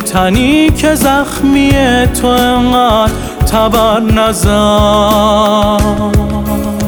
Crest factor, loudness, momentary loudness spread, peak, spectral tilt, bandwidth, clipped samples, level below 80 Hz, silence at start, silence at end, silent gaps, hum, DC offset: 10 dB; -10 LUFS; 4 LU; 0 dBFS; -5 dB/octave; over 20 kHz; under 0.1%; -20 dBFS; 0 s; 0 s; none; none; under 0.1%